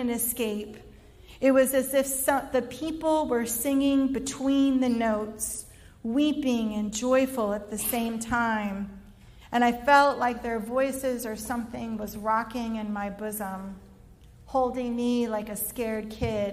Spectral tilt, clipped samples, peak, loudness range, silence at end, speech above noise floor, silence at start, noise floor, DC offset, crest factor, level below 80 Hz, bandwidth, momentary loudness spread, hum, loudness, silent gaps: -4 dB/octave; under 0.1%; -8 dBFS; 5 LU; 0 s; 25 dB; 0 s; -51 dBFS; under 0.1%; 20 dB; -52 dBFS; 16 kHz; 10 LU; none; -27 LUFS; none